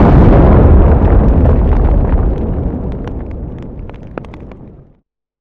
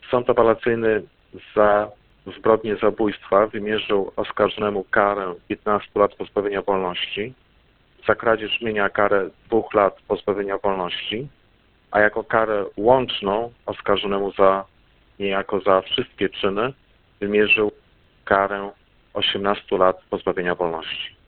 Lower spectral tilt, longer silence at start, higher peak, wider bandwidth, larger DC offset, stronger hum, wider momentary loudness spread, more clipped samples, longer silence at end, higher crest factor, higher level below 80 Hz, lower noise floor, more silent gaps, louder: first, -11.5 dB/octave vs -9.5 dB/octave; about the same, 0 s vs 0.05 s; about the same, 0 dBFS vs 0 dBFS; about the same, 4 kHz vs 4.4 kHz; neither; neither; first, 21 LU vs 9 LU; first, 0.2% vs under 0.1%; first, 0.7 s vs 0.15 s; second, 10 dB vs 22 dB; first, -12 dBFS vs -50 dBFS; second, -53 dBFS vs -58 dBFS; neither; first, -11 LUFS vs -21 LUFS